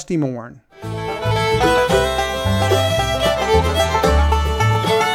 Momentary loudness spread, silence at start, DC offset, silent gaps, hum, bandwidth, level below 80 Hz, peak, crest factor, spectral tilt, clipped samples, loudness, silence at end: 10 LU; 0 s; under 0.1%; none; none; 16.5 kHz; -26 dBFS; -2 dBFS; 14 dB; -5 dB/octave; under 0.1%; -17 LUFS; 0 s